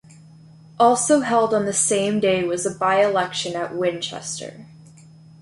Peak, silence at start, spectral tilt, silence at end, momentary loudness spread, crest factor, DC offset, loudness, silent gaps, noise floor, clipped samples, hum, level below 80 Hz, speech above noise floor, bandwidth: -4 dBFS; 0.8 s; -3.5 dB/octave; 0.75 s; 11 LU; 16 dB; under 0.1%; -20 LUFS; none; -46 dBFS; under 0.1%; none; -62 dBFS; 26 dB; 11.5 kHz